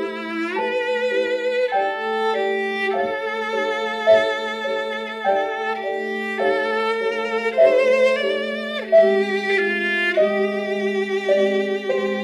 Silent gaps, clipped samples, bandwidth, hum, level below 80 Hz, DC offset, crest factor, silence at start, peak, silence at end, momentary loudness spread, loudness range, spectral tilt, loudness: none; under 0.1%; 12.5 kHz; none; -68 dBFS; under 0.1%; 16 dB; 0 s; -4 dBFS; 0 s; 8 LU; 4 LU; -4.5 dB/octave; -20 LUFS